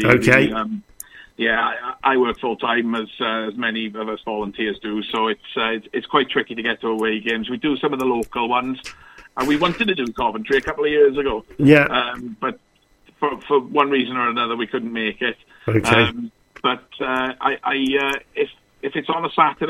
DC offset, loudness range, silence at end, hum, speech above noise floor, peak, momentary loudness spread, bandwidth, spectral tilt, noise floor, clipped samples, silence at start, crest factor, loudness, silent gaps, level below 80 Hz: under 0.1%; 4 LU; 0 s; none; 36 dB; 0 dBFS; 11 LU; 15 kHz; -5.5 dB/octave; -56 dBFS; under 0.1%; 0 s; 20 dB; -20 LUFS; none; -50 dBFS